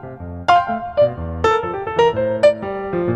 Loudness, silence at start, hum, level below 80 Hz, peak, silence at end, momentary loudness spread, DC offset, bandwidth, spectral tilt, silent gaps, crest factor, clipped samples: -18 LUFS; 0 s; none; -40 dBFS; -2 dBFS; 0 s; 8 LU; under 0.1%; 9.6 kHz; -6 dB/octave; none; 16 dB; under 0.1%